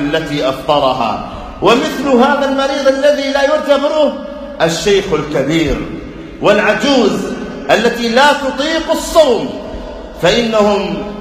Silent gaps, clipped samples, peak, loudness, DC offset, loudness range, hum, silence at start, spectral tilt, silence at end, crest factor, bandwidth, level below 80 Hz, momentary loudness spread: none; 0.3%; 0 dBFS; -13 LUFS; under 0.1%; 2 LU; none; 0 s; -4.5 dB/octave; 0 s; 12 dB; 15.5 kHz; -34 dBFS; 12 LU